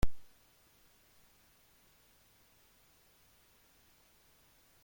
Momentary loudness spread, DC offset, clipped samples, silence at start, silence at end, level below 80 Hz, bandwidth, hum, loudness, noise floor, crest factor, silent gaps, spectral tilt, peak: 0 LU; under 0.1%; under 0.1%; 0.05 s; 4.65 s; -50 dBFS; 16.5 kHz; none; -59 LUFS; -67 dBFS; 24 dB; none; -5.5 dB/octave; -16 dBFS